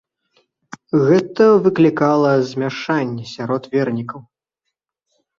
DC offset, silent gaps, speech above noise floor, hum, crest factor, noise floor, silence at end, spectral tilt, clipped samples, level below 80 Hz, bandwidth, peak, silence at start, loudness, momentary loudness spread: under 0.1%; none; 63 dB; none; 16 dB; -79 dBFS; 1.2 s; -7.5 dB/octave; under 0.1%; -60 dBFS; 7.4 kHz; -2 dBFS; 0.95 s; -17 LUFS; 13 LU